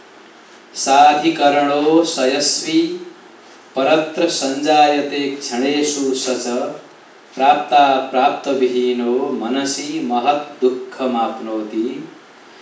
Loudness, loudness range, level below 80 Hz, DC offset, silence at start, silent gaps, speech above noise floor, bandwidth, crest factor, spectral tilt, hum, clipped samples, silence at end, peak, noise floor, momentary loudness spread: -17 LUFS; 4 LU; -86 dBFS; under 0.1%; 0.75 s; none; 27 dB; 8 kHz; 18 dB; -3 dB/octave; none; under 0.1%; 0.45 s; 0 dBFS; -43 dBFS; 11 LU